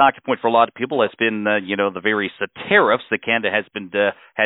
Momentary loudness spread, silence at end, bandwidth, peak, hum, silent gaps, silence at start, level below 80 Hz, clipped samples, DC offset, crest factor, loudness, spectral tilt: 6 LU; 0 s; 4.1 kHz; -2 dBFS; none; none; 0 s; -66 dBFS; under 0.1%; under 0.1%; 18 dB; -19 LUFS; -9.5 dB/octave